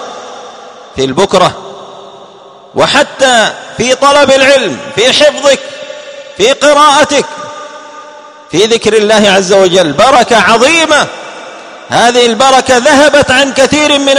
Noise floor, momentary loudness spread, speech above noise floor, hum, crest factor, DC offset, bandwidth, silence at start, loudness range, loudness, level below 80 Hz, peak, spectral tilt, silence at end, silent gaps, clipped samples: -34 dBFS; 20 LU; 27 dB; none; 8 dB; under 0.1%; 15 kHz; 0 s; 4 LU; -7 LUFS; -42 dBFS; 0 dBFS; -2.5 dB/octave; 0 s; none; 2%